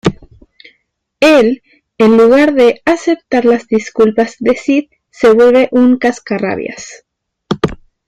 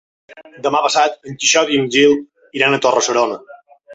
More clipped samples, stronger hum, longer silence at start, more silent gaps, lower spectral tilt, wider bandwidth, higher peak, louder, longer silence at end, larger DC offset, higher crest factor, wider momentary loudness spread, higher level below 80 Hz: neither; neither; second, 0.05 s vs 0.35 s; neither; first, -5.5 dB/octave vs -2.5 dB/octave; first, 11 kHz vs 8.2 kHz; about the same, 0 dBFS vs 0 dBFS; first, -11 LUFS vs -15 LUFS; first, 0.35 s vs 0 s; neither; about the same, 12 dB vs 16 dB; first, 11 LU vs 8 LU; first, -44 dBFS vs -62 dBFS